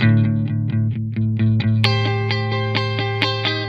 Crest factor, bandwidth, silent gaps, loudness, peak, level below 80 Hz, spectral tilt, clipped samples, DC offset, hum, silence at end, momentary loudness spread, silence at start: 18 dB; 6.8 kHz; none; -19 LUFS; 0 dBFS; -48 dBFS; -7 dB/octave; under 0.1%; under 0.1%; none; 0 s; 4 LU; 0 s